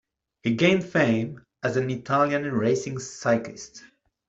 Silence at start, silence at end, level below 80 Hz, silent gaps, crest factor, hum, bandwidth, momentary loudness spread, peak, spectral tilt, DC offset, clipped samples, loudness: 0.45 s; 0.4 s; -62 dBFS; none; 20 dB; none; 8 kHz; 13 LU; -6 dBFS; -5.5 dB/octave; under 0.1%; under 0.1%; -25 LUFS